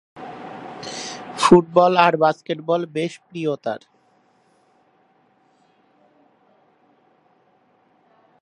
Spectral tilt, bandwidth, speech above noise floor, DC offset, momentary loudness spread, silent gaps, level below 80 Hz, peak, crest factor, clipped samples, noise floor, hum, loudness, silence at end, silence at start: -5.5 dB/octave; 11.5 kHz; 42 dB; under 0.1%; 22 LU; none; -62 dBFS; 0 dBFS; 22 dB; under 0.1%; -60 dBFS; none; -19 LUFS; 4.65 s; 0.15 s